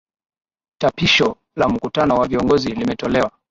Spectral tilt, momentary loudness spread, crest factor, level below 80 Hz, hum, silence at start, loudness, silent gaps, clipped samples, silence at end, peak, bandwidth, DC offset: -5 dB/octave; 7 LU; 16 dB; -44 dBFS; none; 0.8 s; -18 LUFS; none; under 0.1%; 0.2 s; -2 dBFS; 7.8 kHz; under 0.1%